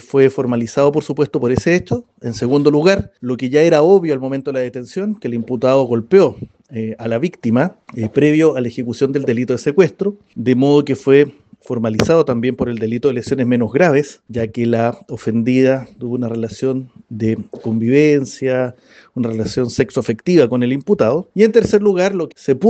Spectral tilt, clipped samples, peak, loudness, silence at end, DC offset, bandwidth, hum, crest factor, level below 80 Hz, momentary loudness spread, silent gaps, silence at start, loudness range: -7 dB/octave; under 0.1%; 0 dBFS; -16 LUFS; 0 s; under 0.1%; 8.6 kHz; none; 16 dB; -50 dBFS; 11 LU; none; 0.15 s; 3 LU